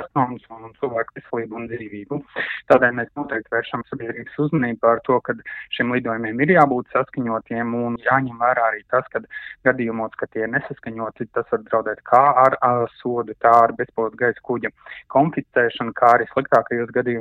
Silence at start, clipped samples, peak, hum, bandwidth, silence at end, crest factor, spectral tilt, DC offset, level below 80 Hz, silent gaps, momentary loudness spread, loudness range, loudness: 0 s; under 0.1%; 0 dBFS; none; 7.4 kHz; 0 s; 20 dB; -8 dB/octave; under 0.1%; -60 dBFS; none; 14 LU; 5 LU; -20 LUFS